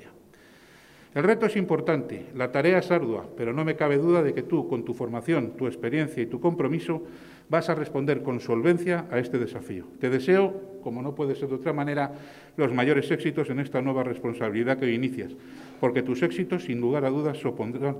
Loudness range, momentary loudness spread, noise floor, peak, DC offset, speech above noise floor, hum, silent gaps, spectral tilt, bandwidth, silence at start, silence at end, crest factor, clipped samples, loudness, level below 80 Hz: 3 LU; 10 LU; -53 dBFS; -6 dBFS; under 0.1%; 27 dB; none; none; -7.5 dB/octave; 13.5 kHz; 0 s; 0 s; 20 dB; under 0.1%; -26 LUFS; -66 dBFS